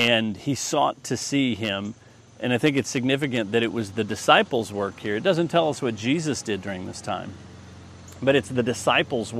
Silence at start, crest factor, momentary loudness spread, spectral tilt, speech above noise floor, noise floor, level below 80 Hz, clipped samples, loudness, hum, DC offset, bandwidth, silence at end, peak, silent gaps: 0 s; 22 dB; 11 LU; -4.5 dB/octave; 20 dB; -44 dBFS; -62 dBFS; under 0.1%; -24 LUFS; none; under 0.1%; 14.5 kHz; 0 s; -2 dBFS; none